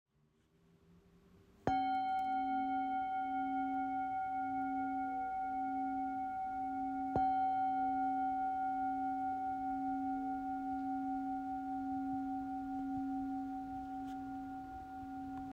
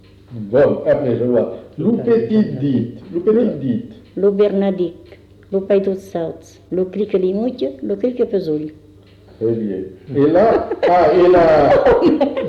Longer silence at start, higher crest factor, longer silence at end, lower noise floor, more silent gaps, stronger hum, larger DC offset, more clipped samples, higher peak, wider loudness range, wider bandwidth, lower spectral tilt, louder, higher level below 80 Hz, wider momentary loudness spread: first, 1.35 s vs 0.3 s; first, 20 dB vs 12 dB; about the same, 0 s vs 0 s; first, -74 dBFS vs -44 dBFS; neither; neither; neither; neither; second, -20 dBFS vs -4 dBFS; about the same, 5 LU vs 7 LU; about the same, 7 kHz vs 7.2 kHz; second, -7 dB/octave vs -8.5 dB/octave; second, -39 LUFS vs -16 LUFS; second, -66 dBFS vs -44 dBFS; second, 9 LU vs 13 LU